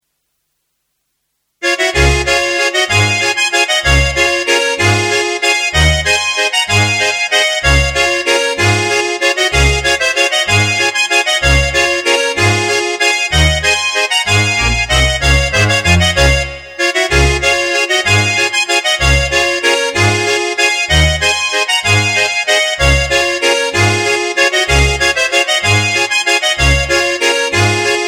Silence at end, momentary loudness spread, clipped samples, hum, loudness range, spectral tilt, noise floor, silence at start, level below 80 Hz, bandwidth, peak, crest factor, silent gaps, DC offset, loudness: 0 s; 2 LU; under 0.1%; none; 1 LU; -3 dB/octave; -68 dBFS; 1.6 s; -22 dBFS; 16.5 kHz; 0 dBFS; 12 dB; none; under 0.1%; -11 LUFS